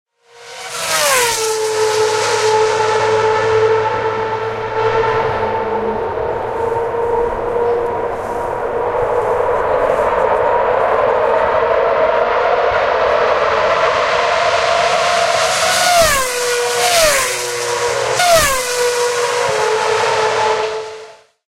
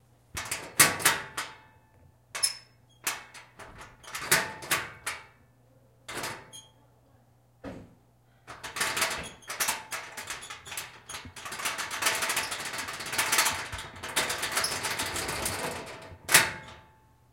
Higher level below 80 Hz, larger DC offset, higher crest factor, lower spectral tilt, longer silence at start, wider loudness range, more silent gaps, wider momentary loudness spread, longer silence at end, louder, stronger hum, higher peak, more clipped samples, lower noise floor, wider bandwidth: first, -40 dBFS vs -60 dBFS; neither; second, 16 dB vs 30 dB; about the same, -1.5 dB/octave vs -0.5 dB/octave; about the same, 0.35 s vs 0.35 s; second, 5 LU vs 9 LU; neither; second, 8 LU vs 23 LU; second, 0.35 s vs 0.5 s; first, -15 LUFS vs -29 LUFS; neither; about the same, 0 dBFS vs -2 dBFS; neither; second, -38 dBFS vs -62 dBFS; about the same, 16 kHz vs 17 kHz